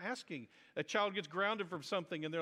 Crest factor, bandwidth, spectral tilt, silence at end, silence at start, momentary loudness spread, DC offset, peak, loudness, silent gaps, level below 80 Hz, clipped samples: 20 dB; 14.5 kHz; -4 dB/octave; 0 s; 0 s; 11 LU; under 0.1%; -20 dBFS; -39 LUFS; none; -88 dBFS; under 0.1%